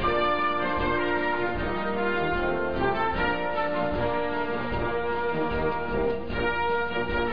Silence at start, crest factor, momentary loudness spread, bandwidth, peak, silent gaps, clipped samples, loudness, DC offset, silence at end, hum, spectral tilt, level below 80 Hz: 0 s; 12 dB; 3 LU; 5.2 kHz; -14 dBFS; none; under 0.1%; -27 LUFS; 2%; 0 s; none; -8 dB/octave; -40 dBFS